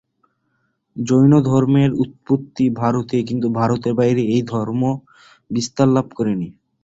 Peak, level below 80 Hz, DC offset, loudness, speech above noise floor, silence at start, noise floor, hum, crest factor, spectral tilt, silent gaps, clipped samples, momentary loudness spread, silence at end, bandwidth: -2 dBFS; -52 dBFS; under 0.1%; -18 LUFS; 51 dB; 0.95 s; -68 dBFS; none; 16 dB; -7.5 dB/octave; none; under 0.1%; 11 LU; 0.35 s; 8 kHz